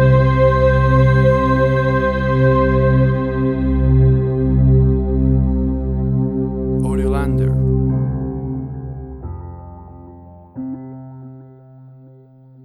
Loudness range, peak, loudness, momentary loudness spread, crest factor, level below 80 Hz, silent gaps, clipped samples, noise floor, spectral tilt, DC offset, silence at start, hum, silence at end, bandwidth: 18 LU; -2 dBFS; -16 LUFS; 18 LU; 14 dB; -24 dBFS; none; under 0.1%; -44 dBFS; -9.5 dB/octave; under 0.1%; 0 s; none; 1.2 s; 4.4 kHz